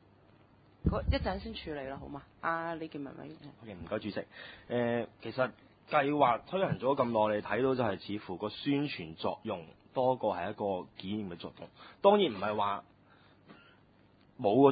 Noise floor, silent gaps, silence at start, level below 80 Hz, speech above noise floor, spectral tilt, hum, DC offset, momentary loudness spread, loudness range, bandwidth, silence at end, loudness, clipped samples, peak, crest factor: -63 dBFS; none; 0.85 s; -50 dBFS; 31 dB; -4.5 dB/octave; none; under 0.1%; 16 LU; 7 LU; 4.9 kHz; 0 s; -33 LUFS; under 0.1%; -10 dBFS; 24 dB